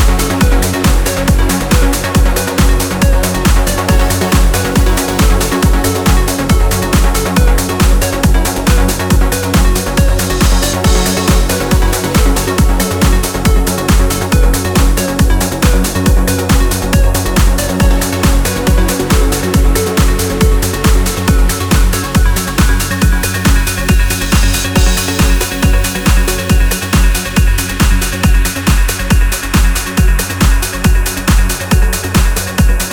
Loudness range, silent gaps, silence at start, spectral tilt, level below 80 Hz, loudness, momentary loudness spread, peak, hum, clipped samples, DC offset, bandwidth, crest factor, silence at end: 1 LU; none; 0 s; -4.5 dB/octave; -12 dBFS; -12 LUFS; 1 LU; 0 dBFS; none; under 0.1%; under 0.1%; 19.5 kHz; 10 dB; 0 s